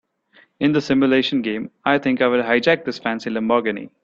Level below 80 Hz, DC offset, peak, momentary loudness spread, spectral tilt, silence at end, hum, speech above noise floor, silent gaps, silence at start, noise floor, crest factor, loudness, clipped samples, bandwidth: -60 dBFS; under 0.1%; -2 dBFS; 8 LU; -6 dB/octave; 0.15 s; none; 36 dB; none; 0.6 s; -55 dBFS; 18 dB; -19 LUFS; under 0.1%; 7.4 kHz